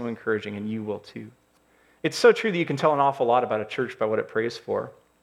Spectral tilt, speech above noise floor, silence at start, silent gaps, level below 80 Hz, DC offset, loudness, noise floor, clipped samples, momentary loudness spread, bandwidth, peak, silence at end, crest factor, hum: -5.5 dB/octave; 37 dB; 0 s; none; -72 dBFS; under 0.1%; -24 LUFS; -62 dBFS; under 0.1%; 14 LU; 13 kHz; -6 dBFS; 0.3 s; 18 dB; none